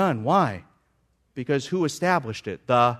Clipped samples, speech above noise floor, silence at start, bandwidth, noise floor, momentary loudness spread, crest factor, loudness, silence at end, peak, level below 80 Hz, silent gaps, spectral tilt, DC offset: under 0.1%; 44 dB; 0 s; 13.5 kHz; -68 dBFS; 15 LU; 18 dB; -24 LUFS; 0 s; -6 dBFS; -64 dBFS; none; -6 dB/octave; under 0.1%